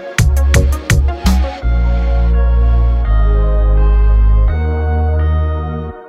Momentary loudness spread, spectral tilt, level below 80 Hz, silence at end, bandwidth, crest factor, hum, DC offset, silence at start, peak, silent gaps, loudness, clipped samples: 4 LU; -6 dB/octave; -12 dBFS; 0 s; 13.5 kHz; 10 dB; none; under 0.1%; 0 s; 0 dBFS; none; -14 LUFS; under 0.1%